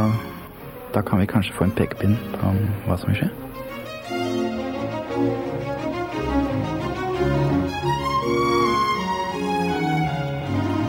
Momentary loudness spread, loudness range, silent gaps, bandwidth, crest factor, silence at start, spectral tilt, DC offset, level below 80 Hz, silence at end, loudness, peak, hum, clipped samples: 7 LU; 4 LU; none; 18 kHz; 16 dB; 0 s; -7 dB/octave; under 0.1%; -42 dBFS; 0 s; -23 LUFS; -6 dBFS; none; under 0.1%